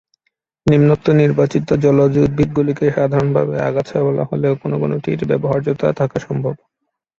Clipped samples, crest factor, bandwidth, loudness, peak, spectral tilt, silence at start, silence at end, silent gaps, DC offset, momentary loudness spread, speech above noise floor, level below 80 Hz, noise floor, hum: under 0.1%; 14 dB; 7.4 kHz; -16 LUFS; -2 dBFS; -9 dB/octave; 0.65 s; 0.65 s; none; under 0.1%; 8 LU; 55 dB; -44 dBFS; -70 dBFS; none